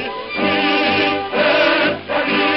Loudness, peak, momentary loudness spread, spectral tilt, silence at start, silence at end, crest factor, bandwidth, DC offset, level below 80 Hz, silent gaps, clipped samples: -16 LUFS; -4 dBFS; 6 LU; -6 dB/octave; 0 s; 0 s; 14 dB; 6.2 kHz; 0.2%; -54 dBFS; none; under 0.1%